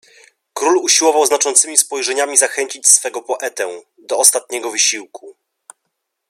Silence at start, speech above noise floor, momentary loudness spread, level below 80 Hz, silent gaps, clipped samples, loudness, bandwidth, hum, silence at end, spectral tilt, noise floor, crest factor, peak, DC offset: 0.55 s; 58 dB; 13 LU; -76 dBFS; none; under 0.1%; -13 LUFS; over 20 kHz; none; 1 s; 2 dB/octave; -74 dBFS; 18 dB; 0 dBFS; under 0.1%